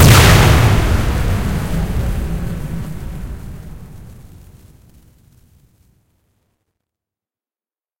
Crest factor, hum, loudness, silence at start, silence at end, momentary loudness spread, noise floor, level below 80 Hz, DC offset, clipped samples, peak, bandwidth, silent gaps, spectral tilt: 16 dB; none; -14 LUFS; 0 s; 3.85 s; 25 LU; under -90 dBFS; -24 dBFS; under 0.1%; under 0.1%; 0 dBFS; 17 kHz; none; -5 dB/octave